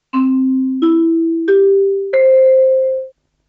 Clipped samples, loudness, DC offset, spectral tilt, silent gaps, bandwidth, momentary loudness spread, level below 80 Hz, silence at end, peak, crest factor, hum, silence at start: under 0.1%; -13 LUFS; under 0.1%; -8 dB/octave; none; 4.3 kHz; 6 LU; -68 dBFS; 0.4 s; -4 dBFS; 8 dB; none; 0.15 s